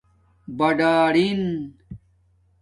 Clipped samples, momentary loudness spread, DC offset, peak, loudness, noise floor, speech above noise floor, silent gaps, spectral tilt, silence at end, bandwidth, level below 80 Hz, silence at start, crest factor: under 0.1%; 17 LU; under 0.1%; -6 dBFS; -20 LUFS; -61 dBFS; 41 dB; none; -6.5 dB/octave; 0.65 s; 11 kHz; -56 dBFS; 0.5 s; 16 dB